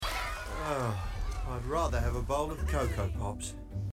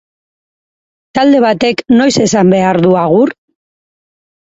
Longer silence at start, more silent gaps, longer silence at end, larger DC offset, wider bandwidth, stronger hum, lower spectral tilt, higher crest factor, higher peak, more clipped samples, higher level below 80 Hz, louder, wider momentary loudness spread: second, 0 s vs 1.15 s; neither; second, 0 s vs 1.1 s; neither; first, 16 kHz vs 8 kHz; neither; about the same, -5.5 dB/octave vs -5.5 dB/octave; about the same, 14 dB vs 12 dB; second, -18 dBFS vs 0 dBFS; neither; first, -38 dBFS vs -50 dBFS; second, -34 LUFS vs -10 LUFS; first, 7 LU vs 4 LU